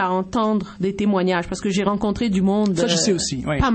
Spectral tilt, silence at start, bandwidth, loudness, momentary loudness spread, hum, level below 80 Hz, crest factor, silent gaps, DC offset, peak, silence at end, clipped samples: -5 dB/octave; 0 s; 8.8 kHz; -20 LUFS; 5 LU; none; -38 dBFS; 16 dB; none; under 0.1%; -4 dBFS; 0 s; under 0.1%